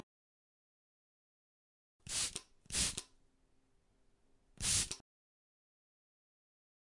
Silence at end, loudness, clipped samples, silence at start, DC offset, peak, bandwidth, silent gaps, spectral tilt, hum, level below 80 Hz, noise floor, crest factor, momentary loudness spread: 2 s; -37 LUFS; under 0.1%; 2.05 s; under 0.1%; -20 dBFS; 11.5 kHz; none; -0.5 dB/octave; none; -60 dBFS; -73 dBFS; 26 dB; 15 LU